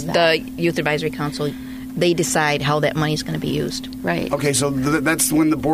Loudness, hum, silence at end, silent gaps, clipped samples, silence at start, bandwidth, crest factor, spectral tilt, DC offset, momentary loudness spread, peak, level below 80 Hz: -20 LUFS; none; 0 s; none; under 0.1%; 0 s; 16 kHz; 16 dB; -4 dB/octave; under 0.1%; 9 LU; -4 dBFS; -44 dBFS